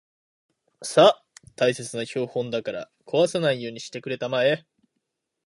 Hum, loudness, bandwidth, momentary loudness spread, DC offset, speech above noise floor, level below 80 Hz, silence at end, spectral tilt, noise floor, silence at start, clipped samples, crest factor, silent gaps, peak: none; -24 LUFS; 11.5 kHz; 16 LU; under 0.1%; 56 dB; -70 dBFS; 0.85 s; -4.5 dB/octave; -79 dBFS; 0.8 s; under 0.1%; 22 dB; none; -2 dBFS